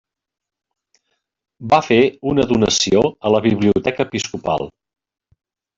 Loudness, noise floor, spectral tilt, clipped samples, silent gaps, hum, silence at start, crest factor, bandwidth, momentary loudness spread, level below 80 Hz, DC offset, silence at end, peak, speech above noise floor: -17 LUFS; -71 dBFS; -4.5 dB/octave; under 0.1%; none; none; 1.6 s; 16 dB; 8 kHz; 8 LU; -48 dBFS; under 0.1%; 1.1 s; -2 dBFS; 54 dB